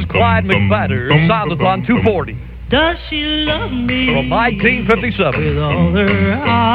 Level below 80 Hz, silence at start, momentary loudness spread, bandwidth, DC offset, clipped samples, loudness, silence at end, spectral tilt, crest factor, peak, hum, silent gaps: -30 dBFS; 0 s; 5 LU; 5.2 kHz; under 0.1%; under 0.1%; -14 LUFS; 0 s; -8.5 dB/octave; 14 dB; 0 dBFS; none; none